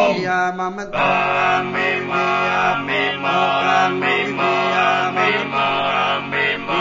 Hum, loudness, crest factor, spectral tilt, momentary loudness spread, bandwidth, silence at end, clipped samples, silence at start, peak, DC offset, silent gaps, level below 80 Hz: none; -17 LUFS; 16 dB; -4.5 dB/octave; 3 LU; 7.8 kHz; 0 s; under 0.1%; 0 s; -4 dBFS; under 0.1%; none; -56 dBFS